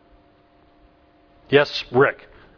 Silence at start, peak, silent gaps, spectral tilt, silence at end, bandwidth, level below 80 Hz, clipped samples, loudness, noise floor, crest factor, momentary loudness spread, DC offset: 1.5 s; 0 dBFS; none; -6 dB/octave; 0.45 s; 5.4 kHz; -56 dBFS; under 0.1%; -19 LUFS; -56 dBFS; 22 dB; 5 LU; under 0.1%